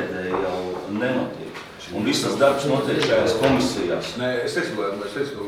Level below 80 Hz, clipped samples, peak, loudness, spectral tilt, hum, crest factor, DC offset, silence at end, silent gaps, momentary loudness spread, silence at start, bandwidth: -52 dBFS; under 0.1%; -4 dBFS; -23 LUFS; -4.5 dB/octave; none; 20 dB; under 0.1%; 0 s; none; 10 LU; 0 s; 16 kHz